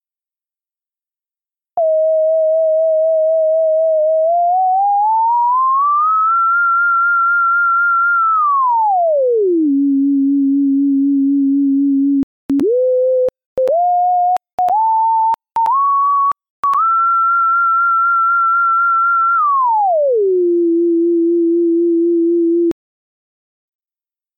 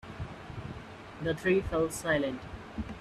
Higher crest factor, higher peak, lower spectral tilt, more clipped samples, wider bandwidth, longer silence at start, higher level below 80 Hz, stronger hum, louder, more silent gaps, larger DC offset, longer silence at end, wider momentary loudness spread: second, 4 dB vs 18 dB; first, -10 dBFS vs -16 dBFS; first, -8 dB/octave vs -5.5 dB/octave; neither; second, 3.4 kHz vs 13 kHz; first, 1.75 s vs 0.05 s; second, -62 dBFS vs -50 dBFS; neither; first, -13 LUFS vs -33 LUFS; first, 12.23-12.49 s, 13.46-13.56 s, 14.53-14.58 s, 16.50-16.63 s vs none; neither; first, 1.65 s vs 0 s; second, 4 LU vs 15 LU